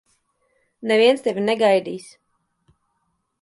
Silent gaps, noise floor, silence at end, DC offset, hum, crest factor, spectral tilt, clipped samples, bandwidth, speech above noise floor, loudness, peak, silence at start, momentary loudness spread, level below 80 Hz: none; -72 dBFS; 1.4 s; under 0.1%; none; 18 dB; -4.5 dB/octave; under 0.1%; 11.5 kHz; 53 dB; -18 LUFS; -4 dBFS; 0.8 s; 17 LU; -72 dBFS